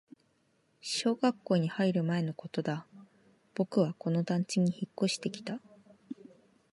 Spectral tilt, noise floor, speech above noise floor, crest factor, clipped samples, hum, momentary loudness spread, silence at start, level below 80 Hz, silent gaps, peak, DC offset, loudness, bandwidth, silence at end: -6 dB/octave; -72 dBFS; 41 dB; 18 dB; under 0.1%; none; 15 LU; 0.85 s; -78 dBFS; none; -14 dBFS; under 0.1%; -32 LUFS; 11.5 kHz; 0.6 s